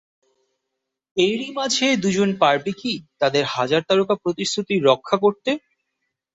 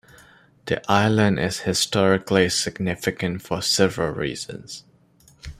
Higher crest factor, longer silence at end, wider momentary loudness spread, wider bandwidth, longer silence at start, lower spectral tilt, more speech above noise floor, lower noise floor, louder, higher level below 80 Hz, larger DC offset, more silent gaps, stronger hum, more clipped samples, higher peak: about the same, 20 dB vs 20 dB; first, 0.8 s vs 0.05 s; second, 8 LU vs 16 LU; second, 8.2 kHz vs 15.5 kHz; first, 1.15 s vs 0.65 s; about the same, -4 dB/octave vs -4 dB/octave; first, 60 dB vs 34 dB; first, -80 dBFS vs -55 dBFS; about the same, -20 LUFS vs -21 LUFS; second, -64 dBFS vs -50 dBFS; neither; neither; neither; neither; about the same, -2 dBFS vs -2 dBFS